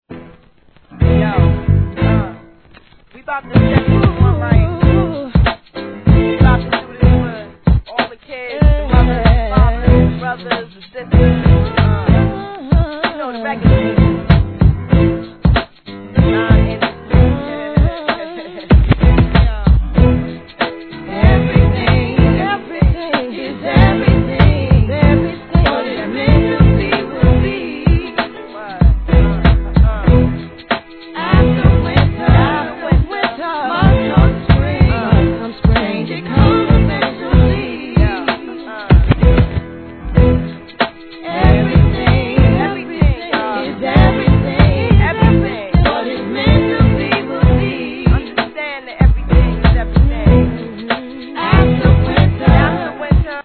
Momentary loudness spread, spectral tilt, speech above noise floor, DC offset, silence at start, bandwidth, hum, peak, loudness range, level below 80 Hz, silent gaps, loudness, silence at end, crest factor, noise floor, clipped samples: 10 LU; -11 dB/octave; 36 dB; 0.3%; 0.1 s; 4.5 kHz; none; 0 dBFS; 2 LU; -18 dBFS; none; -14 LUFS; 0 s; 12 dB; -48 dBFS; 0.2%